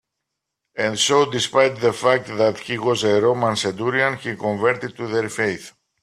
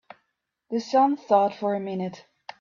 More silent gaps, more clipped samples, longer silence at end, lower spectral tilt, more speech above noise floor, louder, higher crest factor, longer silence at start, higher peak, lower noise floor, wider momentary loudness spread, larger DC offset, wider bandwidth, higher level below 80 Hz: neither; neither; about the same, 0.35 s vs 0.4 s; second, -3.5 dB/octave vs -6.5 dB/octave; first, 61 dB vs 54 dB; first, -20 LUFS vs -24 LUFS; about the same, 18 dB vs 18 dB; about the same, 0.75 s vs 0.7 s; first, -2 dBFS vs -8 dBFS; about the same, -80 dBFS vs -78 dBFS; second, 8 LU vs 15 LU; neither; first, 14 kHz vs 7.4 kHz; first, -62 dBFS vs -76 dBFS